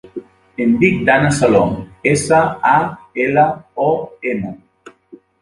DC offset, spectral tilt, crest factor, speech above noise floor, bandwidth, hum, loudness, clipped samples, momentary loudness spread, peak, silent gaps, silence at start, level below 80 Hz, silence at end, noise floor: under 0.1%; -6 dB/octave; 16 dB; 30 dB; 11.5 kHz; none; -15 LUFS; under 0.1%; 11 LU; 0 dBFS; none; 0.15 s; -46 dBFS; 0.5 s; -44 dBFS